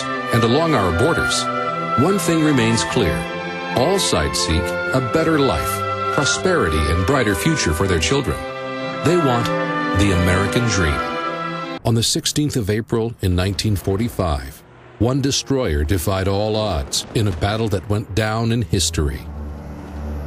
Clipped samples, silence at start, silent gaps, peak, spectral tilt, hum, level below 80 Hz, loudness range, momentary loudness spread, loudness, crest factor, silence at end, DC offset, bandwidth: under 0.1%; 0 s; none; -4 dBFS; -4.5 dB/octave; none; -32 dBFS; 3 LU; 8 LU; -19 LUFS; 14 dB; 0 s; under 0.1%; 15.5 kHz